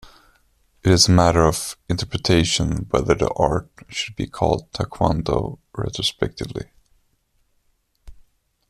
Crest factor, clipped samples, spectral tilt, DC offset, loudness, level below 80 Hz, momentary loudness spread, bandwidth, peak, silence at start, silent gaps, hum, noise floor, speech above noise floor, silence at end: 20 dB; under 0.1%; -4.5 dB/octave; under 0.1%; -20 LUFS; -38 dBFS; 15 LU; 14.5 kHz; -2 dBFS; 0.85 s; none; none; -65 dBFS; 45 dB; 0.5 s